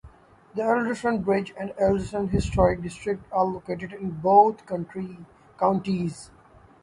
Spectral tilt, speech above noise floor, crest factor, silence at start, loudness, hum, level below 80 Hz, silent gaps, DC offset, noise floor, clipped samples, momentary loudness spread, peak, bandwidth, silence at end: -7 dB/octave; 26 dB; 20 dB; 0.05 s; -25 LUFS; none; -42 dBFS; none; under 0.1%; -51 dBFS; under 0.1%; 15 LU; -4 dBFS; 11.5 kHz; 0.55 s